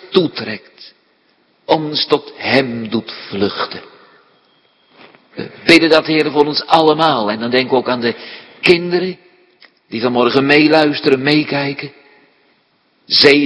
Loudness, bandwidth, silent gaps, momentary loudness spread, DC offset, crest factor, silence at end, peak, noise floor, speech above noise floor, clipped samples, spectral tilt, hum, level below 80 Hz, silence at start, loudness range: -14 LUFS; 11 kHz; none; 18 LU; under 0.1%; 16 dB; 0 s; 0 dBFS; -58 dBFS; 44 dB; 0.2%; -5.5 dB/octave; none; -56 dBFS; 0 s; 6 LU